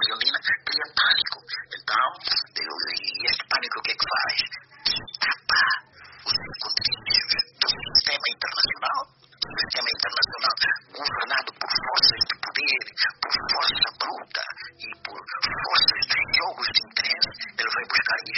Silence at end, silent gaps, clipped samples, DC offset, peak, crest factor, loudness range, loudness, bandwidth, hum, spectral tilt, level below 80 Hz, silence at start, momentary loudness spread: 0 s; none; under 0.1%; under 0.1%; -4 dBFS; 22 dB; 2 LU; -23 LUFS; 6.2 kHz; none; 3 dB/octave; -58 dBFS; 0 s; 11 LU